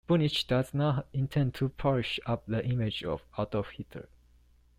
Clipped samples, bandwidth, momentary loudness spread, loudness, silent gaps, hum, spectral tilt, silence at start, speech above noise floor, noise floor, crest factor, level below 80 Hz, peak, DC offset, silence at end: under 0.1%; 14.5 kHz; 9 LU; -31 LUFS; none; 60 Hz at -50 dBFS; -7 dB/octave; 0.1 s; 32 dB; -62 dBFS; 16 dB; -52 dBFS; -14 dBFS; under 0.1%; 0.75 s